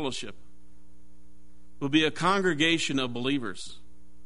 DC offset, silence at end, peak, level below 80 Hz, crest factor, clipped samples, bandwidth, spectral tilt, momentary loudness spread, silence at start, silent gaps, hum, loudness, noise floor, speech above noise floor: 1%; 0.5 s; -10 dBFS; -58 dBFS; 20 dB; under 0.1%; 11 kHz; -4 dB/octave; 17 LU; 0 s; none; none; -27 LUFS; -58 dBFS; 31 dB